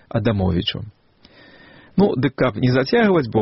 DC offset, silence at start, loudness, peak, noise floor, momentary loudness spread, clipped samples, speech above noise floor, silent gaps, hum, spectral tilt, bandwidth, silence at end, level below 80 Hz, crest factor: under 0.1%; 0.15 s; -19 LUFS; -4 dBFS; -49 dBFS; 9 LU; under 0.1%; 32 dB; none; none; -5.5 dB/octave; 6 kHz; 0 s; -44 dBFS; 14 dB